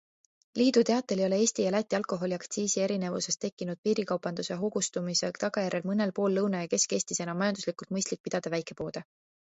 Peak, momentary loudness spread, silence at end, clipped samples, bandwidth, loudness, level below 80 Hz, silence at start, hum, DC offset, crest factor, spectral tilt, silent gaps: -12 dBFS; 8 LU; 0.55 s; under 0.1%; 8.2 kHz; -30 LUFS; -72 dBFS; 0.55 s; none; under 0.1%; 18 dB; -4 dB/octave; 3.52-3.57 s, 3.78-3.83 s, 8.20-8.24 s